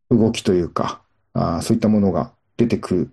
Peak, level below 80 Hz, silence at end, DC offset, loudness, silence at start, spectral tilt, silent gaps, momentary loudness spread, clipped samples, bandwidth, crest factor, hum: -4 dBFS; -48 dBFS; 0.05 s; under 0.1%; -20 LUFS; 0.1 s; -7 dB/octave; none; 11 LU; under 0.1%; 12.5 kHz; 16 dB; none